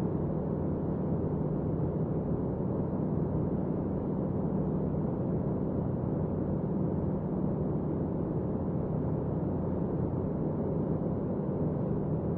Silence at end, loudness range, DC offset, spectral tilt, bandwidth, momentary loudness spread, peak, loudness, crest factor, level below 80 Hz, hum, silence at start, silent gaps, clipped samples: 0 s; 0 LU; under 0.1%; -12.5 dB/octave; 2.8 kHz; 1 LU; -18 dBFS; -32 LUFS; 12 dB; -46 dBFS; none; 0 s; none; under 0.1%